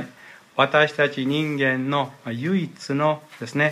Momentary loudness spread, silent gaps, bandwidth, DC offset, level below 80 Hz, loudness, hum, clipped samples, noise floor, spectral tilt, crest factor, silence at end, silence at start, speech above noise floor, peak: 11 LU; none; 14.5 kHz; under 0.1%; -72 dBFS; -23 LUFS; none; under 0.1%; -47 dBFS; -6 dB/octave; 20 dB; 0 s; 0 s; 25 dB; -4 dBFS